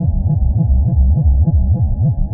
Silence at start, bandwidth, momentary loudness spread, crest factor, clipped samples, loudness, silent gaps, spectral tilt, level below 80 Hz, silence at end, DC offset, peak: 0 s; 1 kHz; 3 LU; 10 dB; under 0.1%; -15 LUFS; none; -19 dB/octave; -14 dBFS; 0 s; under 0.1%; -2 dBFS